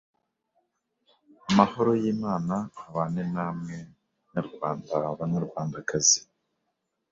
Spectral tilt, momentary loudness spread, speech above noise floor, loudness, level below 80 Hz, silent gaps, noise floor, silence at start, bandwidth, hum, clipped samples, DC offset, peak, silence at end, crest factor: -4 dB/octave; 14 LU; 52 dB; -27 LUFS; -62 dBFS; none; -79 dBFS; 1.45 s; 7.8 kHz; none; under 0.1%; under 0.1%; -4 dBFS; 0.9 s; 26 dB